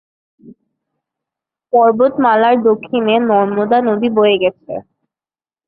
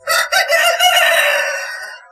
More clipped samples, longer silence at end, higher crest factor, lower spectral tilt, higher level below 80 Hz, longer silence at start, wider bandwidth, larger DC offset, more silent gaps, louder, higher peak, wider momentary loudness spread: neither; first, 0.85 s vs 0.15 s; about the same, 14 dB vs 14 dB; first, -10.5 dB/octave vs 3 dB/octave; about the same, -60 dBFS vs -60 dBFS; first, 0.45 s vs 0.05 s; second, 4.7 kHz vs 15.5 kHz; neither; neither; about the same, -13 LUFS vs -12 LUFS; about the same, -2 dBFS vs 0 dBFS; second, 7 LU vs 13 LU